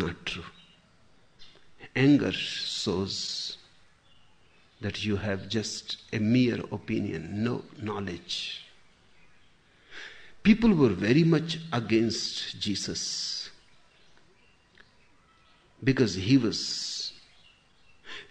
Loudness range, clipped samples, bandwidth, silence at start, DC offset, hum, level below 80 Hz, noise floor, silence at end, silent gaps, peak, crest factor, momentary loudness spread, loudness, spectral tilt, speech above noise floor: 9 LU; under 0.1%; 9.8 kHz; 0 s; under 0.1%; none; -56 dBFS; -62 dBFS; 0.05 s; none; -8 dBFS; 20 dB; 15 LU; -28 LUFS; -5 dB/octave; 36 dB